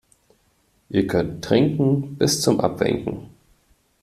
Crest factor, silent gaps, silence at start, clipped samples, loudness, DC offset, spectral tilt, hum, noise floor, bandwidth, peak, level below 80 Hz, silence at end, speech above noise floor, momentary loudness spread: 20 dB; none; 0.9 s; under 0.1%; -21 LUFS; under 0.1%; -5.5 dB/octave; none; -63 dBFS; 13.5 kHz; -4 dBFS; -50 dBFS; 0.75 s; 43 dB; 7 LU